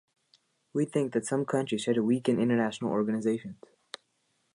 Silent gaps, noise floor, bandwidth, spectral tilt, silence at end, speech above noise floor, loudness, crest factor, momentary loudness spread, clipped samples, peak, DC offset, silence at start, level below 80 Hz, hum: none; -75 dBFS; 11 kHz; -6 dB/octave; 1.05 s; 46 dB; -29 LUFS; 18 dB; 19 LU; under 0.1%; -12 dBFS; under 0.1%; 0.75 s; -74 dBFS; none